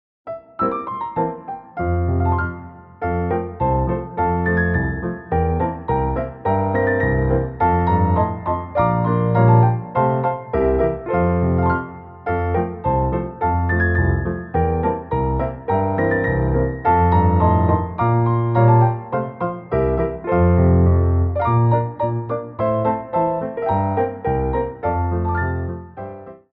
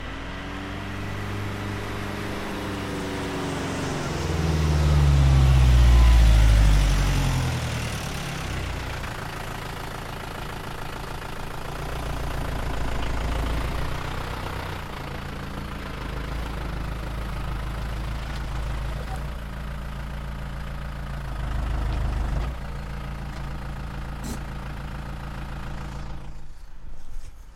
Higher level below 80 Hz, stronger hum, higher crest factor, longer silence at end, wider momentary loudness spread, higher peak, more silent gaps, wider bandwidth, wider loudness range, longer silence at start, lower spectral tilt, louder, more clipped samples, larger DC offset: second, -32 dBFS vs -26 dBFS; neither; about the same, 16 dB vs 18 dB; first, 0.2 s vs 0 s; second, 9 LU vs 16 LU; first, -2 dBFS vs -8 dBFS; neither; second, 4 kHz vs 15 kHz; second, 4 LU vs 14 LU; first, 0.25 s vs 0 s; first, -12.5 dB/octave vs -5.5 dB/octave; first, -19 LUFS vs -27 LUFS; neither; neither